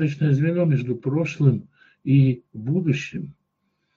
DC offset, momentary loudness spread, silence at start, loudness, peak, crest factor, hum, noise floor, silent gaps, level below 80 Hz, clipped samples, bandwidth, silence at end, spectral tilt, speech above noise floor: under 0.1%; 14 LU; 0 s; -22 LUFS; -6 dBFS; 16 dB; none; -73 dBFS; none; -62 dBFS; under 0.1%; 7 kHz; 0.65 s; -8.5 dB/octave; 52 dB